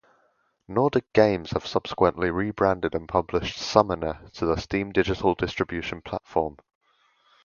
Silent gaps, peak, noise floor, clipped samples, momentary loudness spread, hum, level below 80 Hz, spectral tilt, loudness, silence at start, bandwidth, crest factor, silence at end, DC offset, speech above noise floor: none; 0 dBFS; -68 dBFS; under 0.1%; 8 LU; none; -46 dBFS; -6 dB/octave; -25 LUFS; 0.7 s; 7.2 kHz; 24 dB; 0.9 s; under 0.1%; 43 dB